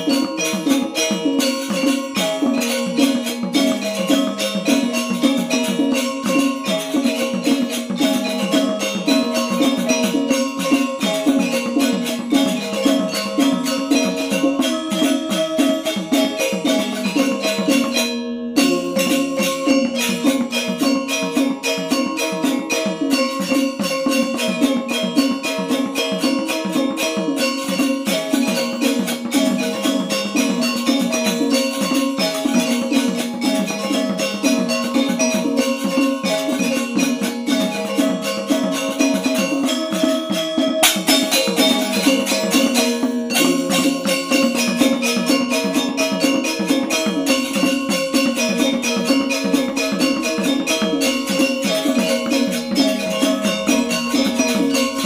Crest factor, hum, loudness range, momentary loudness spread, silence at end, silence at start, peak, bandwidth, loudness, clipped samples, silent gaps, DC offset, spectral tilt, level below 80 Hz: 16 dB; none; 3 LU; 3 LU; 0 s; 0 s; -2 dBFS; 16.5 kHz; -18 LUFS; under 0.1%; none; under 0.1%; -3.5 dB/octave; -60 dBFS